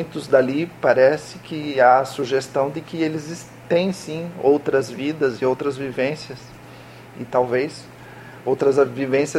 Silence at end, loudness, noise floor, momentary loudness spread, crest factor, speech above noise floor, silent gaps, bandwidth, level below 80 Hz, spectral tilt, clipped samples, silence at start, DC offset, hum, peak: 0 s; -20 LUFS; -41 dBFS; 22 LU; 20 dB; 21 dB; none; 15 kHz; -60 dBFS; -5.5 dB/octave; under 0.1%; 0 s; under 0.1%; none; -2 dBFS